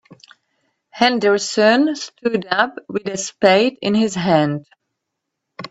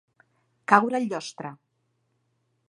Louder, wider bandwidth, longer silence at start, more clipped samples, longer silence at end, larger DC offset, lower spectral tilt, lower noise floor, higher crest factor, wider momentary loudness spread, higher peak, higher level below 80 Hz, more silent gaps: first, -17 LUFS vs -23 LUFS; second, 8.4 kHz vs 11.5 kHz; second, 0.1 s vs 0.7 s; neither; second, 0.05 s vs 1.15 s; neither; about the same, -4.5 dB/octave vs -5 dB/octave; first, -78 dBFS vs -73 dBFS; second, 18 dB vs 28 dB; second, 11 LU vs 19 LU; about the same, 0 dBFS vs -2 dBFS; first, -62 dBFS vs -82 dBFS; neither